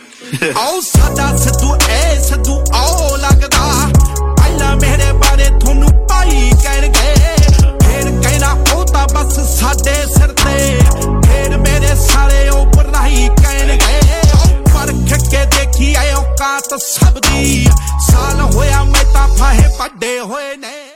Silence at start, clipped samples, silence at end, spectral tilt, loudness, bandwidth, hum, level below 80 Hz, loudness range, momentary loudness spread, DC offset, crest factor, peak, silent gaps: 0.2 s; 0.1%; 0.1 s; -4.5 dB/octave; -11 LUFS; 17 kHz; none; -10 dBFS; 1 LU; 4 LU; under 0.1%; 10 dB; 0 dBFS; none